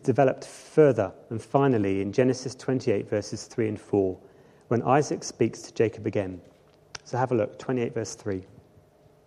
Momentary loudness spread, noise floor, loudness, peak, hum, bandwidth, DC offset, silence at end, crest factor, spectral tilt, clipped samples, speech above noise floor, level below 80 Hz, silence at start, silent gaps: 12 LU; -57 dBFS; -26 LUFS; -6 dBFS; none; 11.5 kHz; under 0.1%; 0.85 s; 20 dB; -6.5 dB/octave; under 0.1%; 32 dB; -66 dBFS; 0.05 s; none